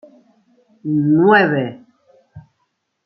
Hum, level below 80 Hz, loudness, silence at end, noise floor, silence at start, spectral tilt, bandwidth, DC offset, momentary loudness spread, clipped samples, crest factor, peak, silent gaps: none; -64 dBFS; -15 LUFS; 0.65 s; -70 dBFS; 0.85 s; -10 dB/octave; 5.8 kHz; under 0.1%; 16 LU; under 0.1%; 18 dB; -2 dBFS; none